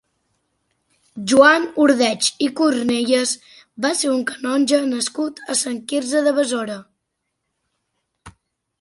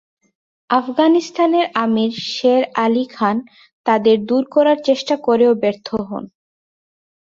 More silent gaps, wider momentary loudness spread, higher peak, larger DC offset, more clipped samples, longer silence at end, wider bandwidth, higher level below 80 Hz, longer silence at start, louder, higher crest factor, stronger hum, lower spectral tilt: second, none vs 3.73-3.84 s; about the same, 11 LU vs 10 LU; about the same, 0 dBFS vs -2 dBFS; neither; neither; second, 0.5 s vs 0.95 s; first, 11.5 kHz vs 7.6 kHz; about the same, -62 dBFS vs -62 dBFS; first, 1.15 s vs 0.7 s; about the same, -18 LUFS vs -17 LUFS; about the same, 20 dB vs 16 dB; neither; second, -2.5 dB/octave vs -5.5 dB/octave